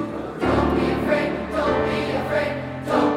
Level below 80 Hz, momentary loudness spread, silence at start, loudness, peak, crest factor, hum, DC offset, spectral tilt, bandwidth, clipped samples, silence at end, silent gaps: -38 dBFS; 5 LU; 0 s; -22 LUFS; -6 dBFS; 16 dB; none; under 0.1%; -6.5 dB/octave; 16 kHz; under 0.1%; 0 s; none